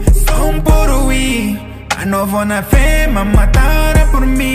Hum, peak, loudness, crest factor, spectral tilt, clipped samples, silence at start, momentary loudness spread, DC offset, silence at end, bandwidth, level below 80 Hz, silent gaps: none; 0 dBFS; -13 LUFS; 10 dB; -5.5 dB/octave; under 0.1%; 0 s; 5 LU; under 0.1%; 0 s; 16 kHz; -12 dBFS; none